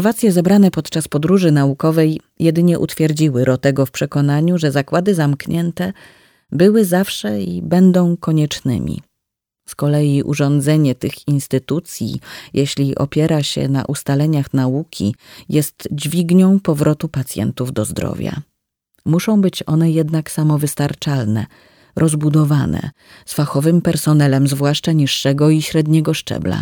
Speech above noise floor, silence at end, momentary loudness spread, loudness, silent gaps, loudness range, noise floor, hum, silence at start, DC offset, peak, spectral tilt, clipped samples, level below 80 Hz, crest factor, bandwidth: 64 dB; 0 s; 10 LU; -16 LUFS; none; 3 LU; -79 dBFS; none; 0 s; under 0.1%; 0 dBFS; -6.5 dB/octave; under 0.1%; -48 dBFS; 14 dB; 19.5 kHz